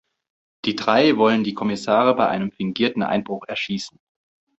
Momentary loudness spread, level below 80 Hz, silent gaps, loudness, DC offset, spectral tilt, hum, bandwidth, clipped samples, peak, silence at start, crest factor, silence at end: 11 LU; -62 dBFS; none; -21 LUFS; under 0.1%; -5.5 dB/octave; none; 8.2 kHz; under 0.1%; -2 dBFS; 0.65 s; 20 dB; 0.7 s